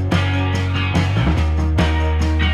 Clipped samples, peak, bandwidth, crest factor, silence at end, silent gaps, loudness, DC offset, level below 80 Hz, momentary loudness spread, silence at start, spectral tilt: under 0.1%; -4 dBFS; 10.5 kHz; 12 dB; 0 s; none; -18 LUFS; under 0.1%; -22 dBFS; 2 LU; 0 s; -6.5 dB/octave